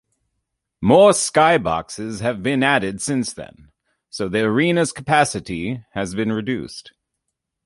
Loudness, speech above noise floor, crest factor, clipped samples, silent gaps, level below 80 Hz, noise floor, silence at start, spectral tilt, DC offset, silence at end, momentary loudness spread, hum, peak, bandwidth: -19 LUFS; 60 dB; 18 dB; under 0.1%; none; -50 dBFS; -78 dBFS; 0.8 s; -4.5 dB/octave; under 0.1%; 0.75 s; 15 LU; none; -2 dBFS; 11.5 kHz